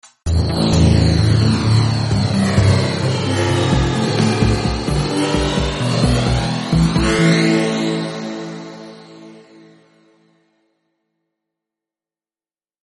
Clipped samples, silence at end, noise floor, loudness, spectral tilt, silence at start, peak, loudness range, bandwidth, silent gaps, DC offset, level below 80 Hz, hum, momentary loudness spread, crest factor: under 0.1%; 3.45 s; under -90 dBFS; -16 LUFS; -6 dB/octave; 0.25 s; -2 dBFS; 10 LU; 11.5 kHz; none; under 0.1%; -30 dBFS; none; 9 LU; 16 dB